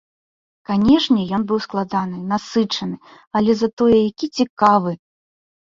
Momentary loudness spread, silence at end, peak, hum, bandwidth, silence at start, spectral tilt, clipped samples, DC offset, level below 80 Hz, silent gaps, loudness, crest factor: 11 LU; 0.7 s; -2 dBFS; none; 7.6 kHz; 0.7 s; -6 dB/octave; under 0.1%; under 0.1%; -50 dBFS; 3.27-3.31 s, 3.73-3.77 s, 4.50-4.57 s; -18 LUFS; 18 dB